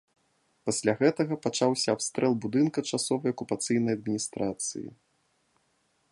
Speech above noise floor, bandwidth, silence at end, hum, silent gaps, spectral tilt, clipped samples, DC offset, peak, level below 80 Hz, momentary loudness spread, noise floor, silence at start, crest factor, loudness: 44 dB; 11.5 kHz; 1.2 s; none; none; -4.5 dB/octave; under 0.1%; under 0.1%; -10 dBFS; -68 dBFS; 7 LU; -72 dBFS; 0.65 s; 20 dB; -28 LUFS